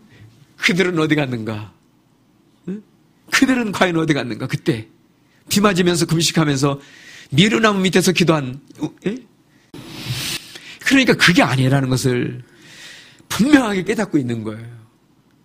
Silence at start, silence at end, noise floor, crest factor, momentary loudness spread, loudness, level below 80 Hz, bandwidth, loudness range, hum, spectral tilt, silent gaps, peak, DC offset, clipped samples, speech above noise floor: 0.2 s; 0.65 s; -56 dBFS; 18 dB; 18 LU; -17 LUFS; -50 dBFS; 15.5 kHz; 5 LU; none; -4.5 dB/octave; none; 0 dBFS; under 0.1%; under 0.1%; 39 dB